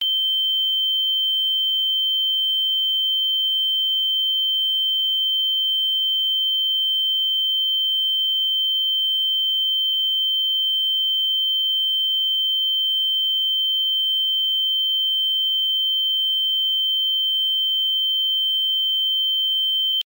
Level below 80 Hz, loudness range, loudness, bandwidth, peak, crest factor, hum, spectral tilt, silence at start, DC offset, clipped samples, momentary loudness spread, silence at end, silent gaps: under -90 dBFS; 0 LU; -17 LUFS; 16 kHz; -14 dBFS; 6 dB; none; 6 dB/octave; 0 s; under 0.1%; under 0.1%; 0 LU; 0.05 s; none